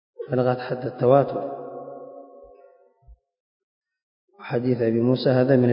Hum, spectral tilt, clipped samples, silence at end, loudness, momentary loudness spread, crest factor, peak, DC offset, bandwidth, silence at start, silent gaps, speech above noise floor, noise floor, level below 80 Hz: none; -12 dB/octave; under 0.1%; 0 s; -22 LUFS; 20 LU; 20 dB; -4 dBFS; under 0.1%; 5.4 kHz; 0.2 s; 3.40-3.81 s, 4.02-4.28 s; 34 dB; -54 dBFS; -62 dBFS